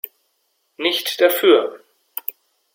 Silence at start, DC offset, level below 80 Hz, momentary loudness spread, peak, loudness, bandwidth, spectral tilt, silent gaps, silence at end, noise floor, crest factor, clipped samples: 0.8 s; under 0.1%; -74 dBFS; 17 LU; -2 dBFS; -18 LUFS; 16.5 kHz; -1.5 dB/octave; none; 1 s; -68 dBFS; 18 dB; under 0.1%